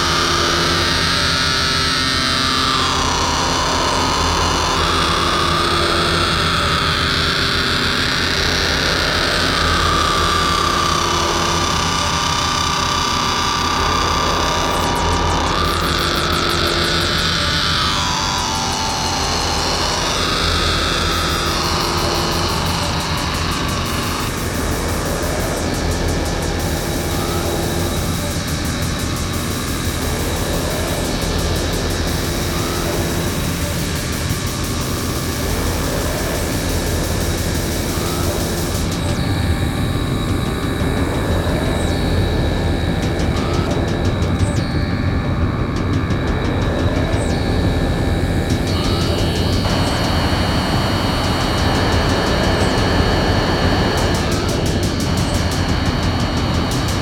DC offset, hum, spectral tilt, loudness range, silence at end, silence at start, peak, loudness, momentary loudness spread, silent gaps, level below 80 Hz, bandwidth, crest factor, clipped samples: under 0.1%; none; -4 dB/octave; 5 LU; 0 s; 0 s; -2 dBFS; -17 LUFS; 5 LU; none; -26 dBFS; 18 kHz; 16 dB; under 0.1%